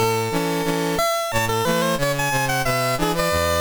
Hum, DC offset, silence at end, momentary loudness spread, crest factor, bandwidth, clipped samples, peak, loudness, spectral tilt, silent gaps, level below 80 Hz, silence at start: none; under 0.1%; 0 s; 2 LU; 12 dB; over 20 kHz; under 0.1%; -8 dBFS; -21 LUFS; -4 dB/octave; none; -38 dBFS; 0 s